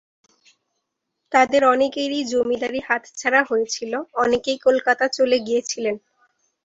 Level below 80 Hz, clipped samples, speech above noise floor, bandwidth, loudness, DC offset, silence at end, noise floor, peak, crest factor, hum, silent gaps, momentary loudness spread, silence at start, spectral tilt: -62 dBFS; under 0.1%; 57 dB; 8 kHz; -20 LUFS; under 0.1%; 0.65 s; -77 dBFS; -4 dBFS; 16 dB; none; none; 8 LU; 1.3 s; -2.5 dB/octave